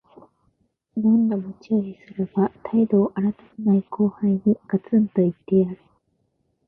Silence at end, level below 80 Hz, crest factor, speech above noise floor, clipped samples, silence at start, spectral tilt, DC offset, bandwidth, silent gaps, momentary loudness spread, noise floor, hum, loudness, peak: 0.95 s; -62 dBFS; 16 dB; 49 dB; under 0.1%; 0.95 s; -12 dB/octave; under 0.1%; 3 kHz; none; 8 LU; -70 dBFS; none; -22 LUFS; -8 dBFS